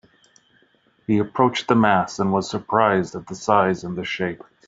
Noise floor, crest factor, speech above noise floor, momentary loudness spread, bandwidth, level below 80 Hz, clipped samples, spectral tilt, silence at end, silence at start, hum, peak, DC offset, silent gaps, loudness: -61 dBFS; 20 dB; 40 dB; 10 LU; 8 kHz; -60 dBFS; under 0.1%; -6 dB/octave; 0.3 s; 1.1 s; none; 0 dBFS; under 0.1%; none; -21 LUFS